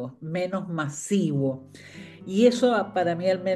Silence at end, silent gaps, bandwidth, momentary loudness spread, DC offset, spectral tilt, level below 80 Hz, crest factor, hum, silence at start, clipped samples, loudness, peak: 0 s; none; 12.5 kHz; 21 LU; under 0.1%; -6 dB/octave; -70 dBFS; 18 dB; none; 0 s; under 0.1%; -25 LUFS; -8 dBFS